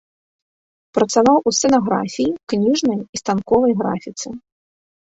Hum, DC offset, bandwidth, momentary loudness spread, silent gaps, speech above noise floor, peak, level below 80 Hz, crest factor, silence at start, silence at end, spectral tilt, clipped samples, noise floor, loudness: none; under 0.1%; 8.2 kHz; 13 LU; 3.09-3.13 s; over 73 dB; -2 dBFS; -54 dBFS; 16 dB; 0.95 s; 0.65 s; -4.5 dB/octave; under 0.1%; under -90 dBFS; -18 LUFS